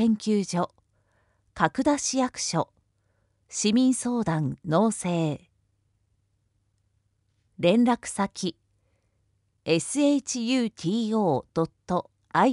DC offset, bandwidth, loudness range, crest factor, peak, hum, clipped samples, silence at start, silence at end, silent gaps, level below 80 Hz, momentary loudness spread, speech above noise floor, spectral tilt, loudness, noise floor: under 0.1%; 11.5 kHz; 3 LU; 20 dB; -6 dBFS; none; under 0.1%; 0 s; 0 s; none; -62 dBFS; 8 LU; 47 dB; -5 dB/octave; -26 LUFS; -71 dBFS